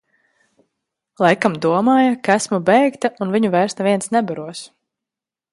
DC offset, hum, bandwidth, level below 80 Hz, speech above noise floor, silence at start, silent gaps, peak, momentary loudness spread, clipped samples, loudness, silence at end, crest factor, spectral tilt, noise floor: under 0.1%; none; 11.5 kHz; -64 dBFS; 71 dB; 1.2 s; none; 0 dBFS; 9 LU; under 0.1%; -17 LUFS; 0.85 s; 18 dB; -5 dB/octave; -87 dBFS